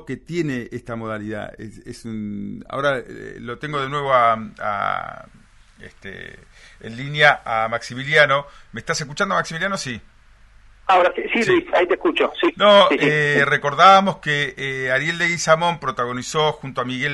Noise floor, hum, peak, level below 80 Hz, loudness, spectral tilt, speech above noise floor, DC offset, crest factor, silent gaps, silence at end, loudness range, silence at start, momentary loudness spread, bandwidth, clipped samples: -49 dBFS; none; 0 dBFS; -50 dBFS; -18 LUFS; -4 dB/octave; 29 dB; under 0.1%; 20 dB; none; 0 s; 9 LU; 0 s; 20 LU; 11.5 kHz; under 0.1%